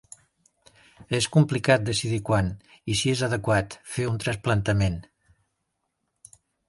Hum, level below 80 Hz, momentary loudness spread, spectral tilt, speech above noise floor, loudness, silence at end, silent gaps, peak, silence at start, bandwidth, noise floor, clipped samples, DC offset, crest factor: none; -46 dBFS; 9 LU; -5 dB/octave; 54 dB; -25 LUFS; 1.65 s; none; -4 dBFS; 1 s; 11.5 kHz; -78 dBFS; under 0.1%; under 0.1%; 22 dB